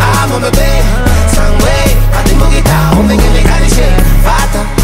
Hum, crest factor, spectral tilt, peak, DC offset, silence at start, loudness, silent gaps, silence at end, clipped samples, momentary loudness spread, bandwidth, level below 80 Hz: none; 6 dB; -5 dB/octave; 0 dBFS; under 0.1%; 0 s; -10 LUFS; none; 0 s; under 0.1%; 3 LU; 16.5 kHz; -8 dBFS